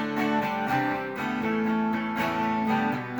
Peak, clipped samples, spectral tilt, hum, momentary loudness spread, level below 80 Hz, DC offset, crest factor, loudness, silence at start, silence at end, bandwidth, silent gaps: -14 dBFS; under 0.1%; -6.5 dB/octave; none; 3 LU; -62 dBFS; under 0.1%; 14 dB; -27 LUFS; 0 s; 0 s; over 20 kHz; none